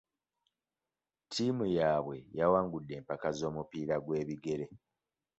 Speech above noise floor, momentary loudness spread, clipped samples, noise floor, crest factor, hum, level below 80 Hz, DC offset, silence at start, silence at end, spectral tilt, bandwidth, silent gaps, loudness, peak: over 56 dB; 11 LU; under 0.1%; under -90 dBFS; 20 dB; none; -64 dBFS; under 0.1%; 1.3 s; 0.65 s; -5.5 dB/octave; 8 kHz; none; -34 LUFS; -16 dBFS